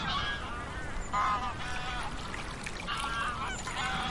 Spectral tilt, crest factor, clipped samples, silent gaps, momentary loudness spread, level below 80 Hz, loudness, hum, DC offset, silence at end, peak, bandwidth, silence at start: -3 dB/octave; 16 dB; under 0.1%; none; 8 LU; -44 dBFS; -34 LUFS; none; under 0.1%; 0 s; -18 dBFS; 11.5 kHz; 0 s